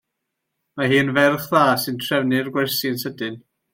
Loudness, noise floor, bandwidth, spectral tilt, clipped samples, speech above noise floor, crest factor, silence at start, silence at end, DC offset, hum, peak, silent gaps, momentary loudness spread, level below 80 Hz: -20 LUFS; -79 dBFS; 16.5 kHz; -5 dB/octave; under 0.1%; 59 dB; 18 dB; 0.75 s; 0.35 s; under 0.1%; none; -4 dBFS; none; 11 LU; -64 dBFS